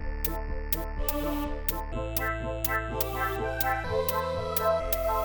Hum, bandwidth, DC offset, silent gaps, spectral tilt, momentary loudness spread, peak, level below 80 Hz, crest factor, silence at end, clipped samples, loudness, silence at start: none; over 20 kHz; under 0.1%; none; -4.5 dB/octave; 5 LU; -8 dBFS; -36 dBFS; 22 dB; 0 s; under 0.1%; -29 LUFS; 0 s